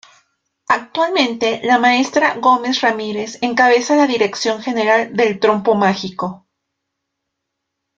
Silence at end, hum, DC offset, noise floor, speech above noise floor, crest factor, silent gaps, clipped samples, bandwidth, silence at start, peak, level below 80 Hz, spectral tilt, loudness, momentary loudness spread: 1.6 s; none; under 0.1%; -77 dBFS; 62 dB; 16 dB; none; under 0.1%; 7.8 kHz; 0.7 s; 0 dBFS; -62 dBFS; -4 dB/octave; -16 LUFS; 9 LU